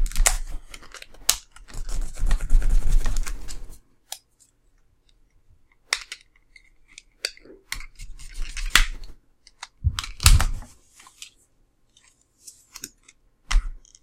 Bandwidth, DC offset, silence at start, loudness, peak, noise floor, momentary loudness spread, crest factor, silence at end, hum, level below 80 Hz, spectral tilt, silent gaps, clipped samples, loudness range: 16.5 kHz; under 0.1%; 0 s; -25 LUFS; 0 dBFS; -62 dBFS; 24 LU; 24 dB; 0.25 s; none; -26 dBFS; -1.5 dB/octave; none; under 0.1%; 11 LU